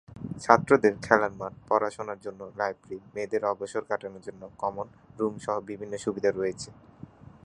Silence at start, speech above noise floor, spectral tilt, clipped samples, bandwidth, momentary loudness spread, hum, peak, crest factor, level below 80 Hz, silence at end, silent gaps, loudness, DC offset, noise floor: 0.1 s; 20 dB; -5.5 dB/octave; under 0.1%; 11 kHz; 18 LU; none; -2 dBFS; 28 dB; -62 dBFS; 0.75 s; none; -28 LUFS; under 0.1%; -49 dBFS